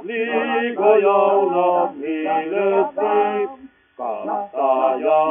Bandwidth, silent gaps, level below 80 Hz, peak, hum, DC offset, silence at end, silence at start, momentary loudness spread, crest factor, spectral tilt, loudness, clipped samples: 3.7 kHz; none; -72 dBFS; -2 dBFS; none; under 0.1%; 0 s; 0 s; 10 LU; 16 dB; -3 dB/octave; -19 LUFS; under 0.1%